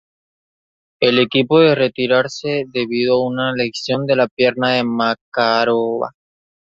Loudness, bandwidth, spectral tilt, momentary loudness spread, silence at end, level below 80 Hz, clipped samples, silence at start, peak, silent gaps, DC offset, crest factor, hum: -16 LUFS; 7.6 kHz; -5.5 dB/octave; 8 LU; 0.65 s; -60 dBFS; under 0.1%; 1 s; -2 dBFS; 4.31-4.37 s, 5.21-5.32 s; under 0.1%; 16 dB; none